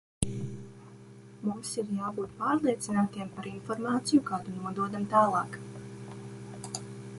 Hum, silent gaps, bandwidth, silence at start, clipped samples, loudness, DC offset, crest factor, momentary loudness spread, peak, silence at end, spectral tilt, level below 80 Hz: none; none; 11.5 kHz; 0.2 s; under 0.1%; -31 LUFS; under 0.1%; 24 dB; 18 LU; -8 dBFS; 0 s; -5.5 dB/octave; -58 dBFS